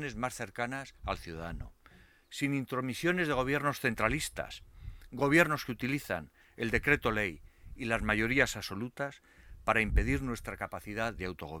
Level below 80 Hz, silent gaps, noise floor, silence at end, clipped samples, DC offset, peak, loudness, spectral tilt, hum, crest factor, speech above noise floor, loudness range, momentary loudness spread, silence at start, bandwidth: -44 dBFS; none; -60 dBFS; 0 s; under 0.1%; under 0.1%; -10 dBFS; -32 LUFS; -5 dB/octave; none; 22 dB; 28 dB; 4 LU; 15 LU; 0 s; 19.5 kHz